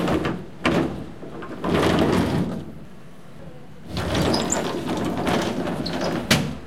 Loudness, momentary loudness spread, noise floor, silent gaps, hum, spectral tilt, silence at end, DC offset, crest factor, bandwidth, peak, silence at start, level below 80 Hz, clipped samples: -23 LUFS; 22 LU; -44 dBFS; none; none; -5 dB/octave; 0 s; 1%; 22 dB; 16.5 kHz; -2 dBFS; 0 s; -44 dBFS; under 0.1%